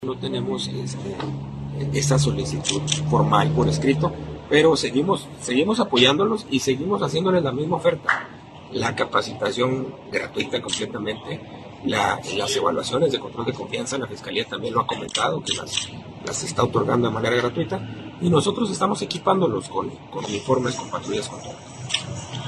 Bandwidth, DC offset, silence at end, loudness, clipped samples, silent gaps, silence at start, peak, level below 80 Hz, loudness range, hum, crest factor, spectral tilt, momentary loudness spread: 12.5 kHz; under 0.1%; 0 s; -23 LUFS; under 0.1%; none; 0 s; -2 dBFS; -50 dBFS; 5 LU; none; 22 dB; -4.5 dB/octave; 12 LU